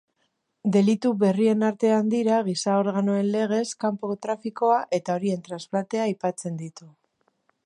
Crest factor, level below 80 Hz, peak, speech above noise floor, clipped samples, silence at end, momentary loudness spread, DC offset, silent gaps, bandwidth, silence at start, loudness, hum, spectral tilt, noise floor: 16 dB; -76 dBFS; -8 dBFS; 50 dB; under 0.1%; 0.75 s; 9 LU; under 0.1%; none; 11 kHz; 0.65 s; -24 LUFS; none; -6 dB/octave; -74 dBFS